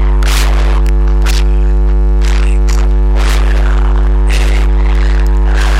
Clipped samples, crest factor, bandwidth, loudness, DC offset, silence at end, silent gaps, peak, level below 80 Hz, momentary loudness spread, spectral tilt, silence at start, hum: under 0.1%; 4 dB; 12 kHz; -12 LUFS; 0.1%; 0 s; none; -4 dBFS; -8 dBFS; 1 LU; -5.5 dB/octave; 0 s; 50 Hz at -10 dBFS